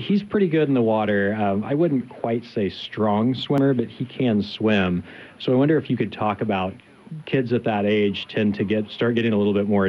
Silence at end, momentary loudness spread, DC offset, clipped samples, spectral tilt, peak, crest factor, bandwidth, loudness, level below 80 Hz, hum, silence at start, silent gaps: 0 s; 7 LU; under 0.1%; under 0.1%; -8.5 dB/octave; -6 dBFS; 14 dB; 6.2 kHz; -22 LUFS; -64 dBFS; none; 0 s; none